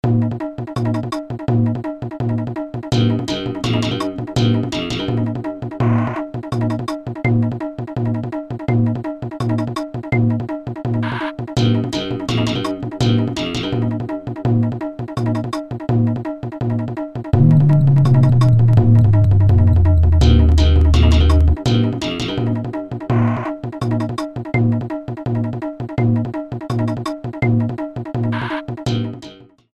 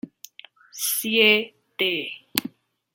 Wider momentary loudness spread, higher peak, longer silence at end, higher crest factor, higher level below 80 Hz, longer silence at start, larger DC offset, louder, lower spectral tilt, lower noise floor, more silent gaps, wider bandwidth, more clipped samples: second, 13 LU vs 23 LU; about the same, 0 dBFS vs 0 dBFS; second, 0.3 s vs 0.45 s; second, 16 dB vs 26 dB; first, -26 dBFS vs -74 dBFS; about the same, 0.05 s vs 0.05 s; neither; first, -18 LUFS vs -22 LUFS; first, -7.5 dB/octave vs -1.5 dB/octave; second, -39 dBFS vs -50 dBFS; neither; second, 9 kHz vs 17 kHz; neither